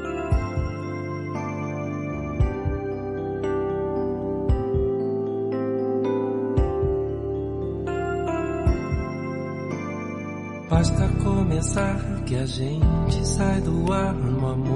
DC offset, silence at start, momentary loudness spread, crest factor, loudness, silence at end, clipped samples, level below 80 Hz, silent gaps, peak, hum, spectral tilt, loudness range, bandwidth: under 0.1%; 0 s; 8 LU; 18 dB; -25 LUFS; 0 s; under 0.1%; -32 dBFS; none; -6 dBFS; none; -7 dB/octave; 4 LU; 11.5 kHz